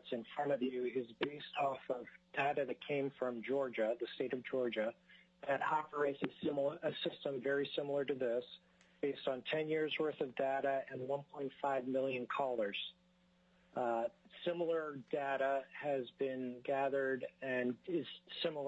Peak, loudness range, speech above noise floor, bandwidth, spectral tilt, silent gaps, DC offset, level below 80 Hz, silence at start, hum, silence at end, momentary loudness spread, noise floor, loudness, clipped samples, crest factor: -22 dBFS; 2 LU; 33 dB; 7.8 kHz; -3 dB/octave; none; under 0.1%; -84 dBFS; 0.05 s; none; 0 s; 6 LU; -72 dBFS; -39 LUFS; under 0.1%; 18 dB